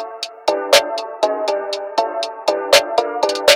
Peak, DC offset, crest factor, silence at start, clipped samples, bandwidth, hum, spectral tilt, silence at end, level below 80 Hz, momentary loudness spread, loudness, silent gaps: 0 dBFS; under 0.1%; 18 dB; 0 s; under 0.1%; 18 kHz; none; 0 dB/octave; 0 s; -62 dBFS; 9 LU; -17 LUFS; none